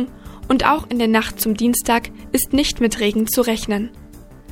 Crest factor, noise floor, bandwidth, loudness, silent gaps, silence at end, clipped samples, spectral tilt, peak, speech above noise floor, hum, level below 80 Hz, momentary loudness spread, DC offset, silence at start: 18 dB; -40 dBFS; 17 kHz; -18 LUFS; none; 0 s; under 0.1%; -3.5 dB/octave; 0 dBFS; 22 dB; none; -38 dBFS; 7 LU; under 0.1%; 0 s